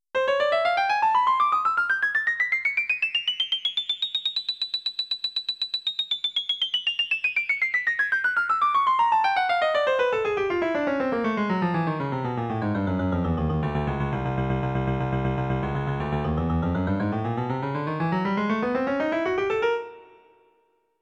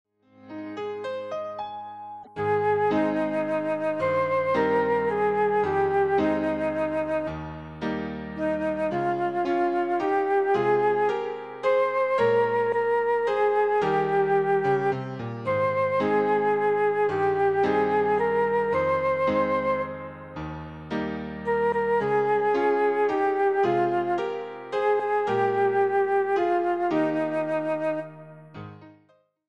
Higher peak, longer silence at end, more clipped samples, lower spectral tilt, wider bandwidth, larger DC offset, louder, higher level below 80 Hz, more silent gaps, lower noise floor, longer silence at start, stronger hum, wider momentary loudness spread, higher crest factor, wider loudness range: about the same, -12 dBFS vs -12 dBFS; first, 0.95 s vs 0.55 s; neither; second, -6 dB/octave vs -7.5 dB/octave; first, 10 kHz vs 7.2 kHz; second, under 0.1% vs 0.1%; about the same, -24 LUFS vs -25 LUFS; first, -44 dBFS vs -58 dBFS; neither; first, -67 dBFS vs -63 dBFS; second, 0.15 s vs 0.45 s; neither; second, 6 LU vs 11 LU; about the same, 14 dB vs 12 dB; about the same, 4 LU vs 4 LU